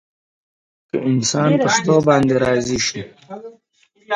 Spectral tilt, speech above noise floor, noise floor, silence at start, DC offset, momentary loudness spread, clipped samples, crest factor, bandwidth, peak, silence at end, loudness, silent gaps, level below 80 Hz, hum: -4.5 dB/octave; 20 dB; -37 dBFS; 0.95 s; under 0.1%; 20 LU; under 0.1%; 18 dB; 10.5 kHz; 0 dBFS; 0 s; -17 LUFS; none; -50 dBFS; none